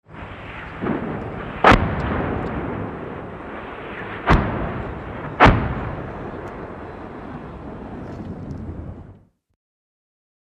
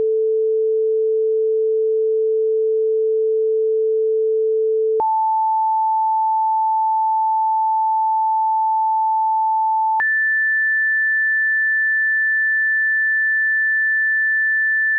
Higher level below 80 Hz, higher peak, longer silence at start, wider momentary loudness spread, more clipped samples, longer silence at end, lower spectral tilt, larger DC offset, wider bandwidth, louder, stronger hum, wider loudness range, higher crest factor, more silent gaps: first, -32 dBFS vs -80 dBFS; first, 0 dBFS vs -14 dBFS; about the same, 0.1 s vs 0 s; first, 20 LU vs 3 LU; neither; first, 1.25 s vs 0 s; first, -7 dB/octave vs 11.5 dB/octave; neither; first, 10.5 kHz vs 2.1 kHz; second, -22 LUFS vs -17 LUFS; neither; first, 14 LU vs 3 LU; first, 24 dB vs 4 dB; neither